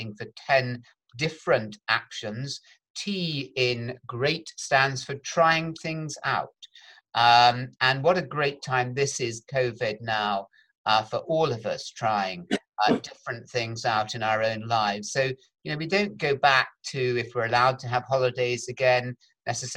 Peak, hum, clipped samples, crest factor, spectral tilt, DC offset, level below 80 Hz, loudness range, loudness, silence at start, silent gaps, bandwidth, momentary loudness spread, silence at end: -6 dBFS; none; under 0.1%; 20 dB; -4 dB/octave; under 0.1%; -64 dBFS; 5 LU; -26 LUFS; 0 s; 2.90-2.95 s, 10.78-10.84 s; 17 kHz; 11 LU; 0 s